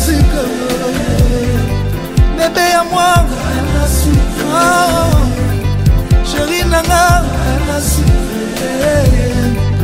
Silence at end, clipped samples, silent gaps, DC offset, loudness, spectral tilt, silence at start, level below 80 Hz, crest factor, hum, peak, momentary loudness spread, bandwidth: 0 s; under 0.1%; none; under 0.1%; -13 LUFS; -5 dB/octave; 0 s; -16 dBFS; 10 dB; none; 0 dBFS; 6 LU; 16.5 kHz